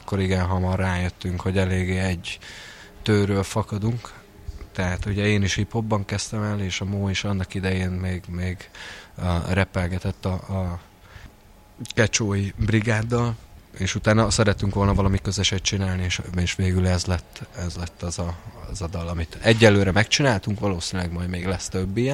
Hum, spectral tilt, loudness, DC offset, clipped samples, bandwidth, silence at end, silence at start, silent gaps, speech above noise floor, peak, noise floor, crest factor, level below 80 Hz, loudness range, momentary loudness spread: none; -5 dB/octave; -24 LUFS; under 0.1%; under 0.1%; 12 kHz; 0 s; 0 s; none; 27 dB; -2 dBFS; -50 dBFS; 22 dB; -40 dBFS; 5 LU; 13 LU